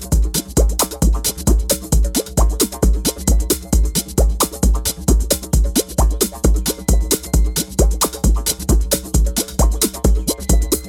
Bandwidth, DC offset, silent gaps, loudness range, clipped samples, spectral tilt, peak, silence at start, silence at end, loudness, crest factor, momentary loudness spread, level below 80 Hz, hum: 18 kHz; under 0.1%; none; 0 LU; under 0.1%; -4.5 dB/octave; 0 dBFS; 0 s; 0 s; -17 LUFS; 16 dB; 2 LU; -18 dBFS; none